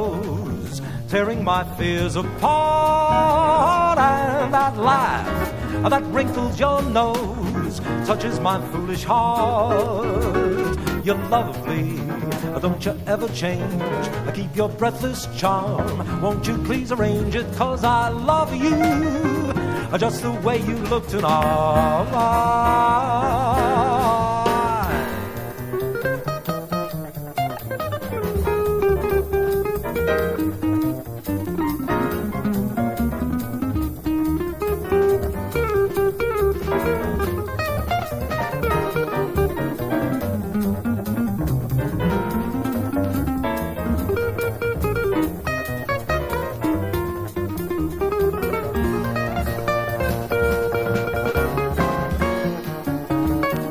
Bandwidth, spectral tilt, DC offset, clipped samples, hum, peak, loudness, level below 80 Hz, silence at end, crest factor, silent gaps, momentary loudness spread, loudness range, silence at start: 16 kHz; -6.5 dB/octave; under 0.1%; under 0.1%; none; -2 dBFS; -22 LUFS; -34 dBFS; 0 s; 18 dB; none; 8 LU; 5 LU; 0 s